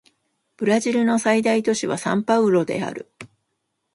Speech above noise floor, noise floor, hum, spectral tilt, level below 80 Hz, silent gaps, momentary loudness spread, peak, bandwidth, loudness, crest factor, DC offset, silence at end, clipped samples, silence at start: 56 dB; -75 dBFS; none; -5 dB/octave; -68 dBFS; none; 10 LU; -4 dBFS; 11.5 kHz; -20 LUFS; 18 dB; under 0.1%; 0.7 s; under 0.1%; 0.6 s